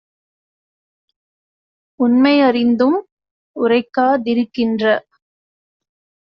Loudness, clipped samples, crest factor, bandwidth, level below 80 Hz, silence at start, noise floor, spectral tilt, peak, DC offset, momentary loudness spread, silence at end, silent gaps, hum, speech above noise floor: -16 LUFS; under 0.1%; 16 dB; 5.8 kHz; -64 dBFS; 2 s; under -90 dBFS; -3 dB/octave; -2 dBFS; under 0.1%; 9 LU; 1.35 s; 3.12-3.17 s, 3.31-3.54 s; none; over 76 dB